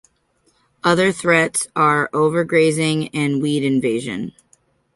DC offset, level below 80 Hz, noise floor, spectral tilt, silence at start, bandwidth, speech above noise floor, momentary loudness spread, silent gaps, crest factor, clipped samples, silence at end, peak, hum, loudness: under 0.1%; -60 dBFS; -63 dBFS; -5 dB/octave; 0.85 s; 11.5 kHz; 45 dB; 7 LU; none; 18 dB; under 0.1%; 0.65 s; -2 dBFS; none; -18 LUFS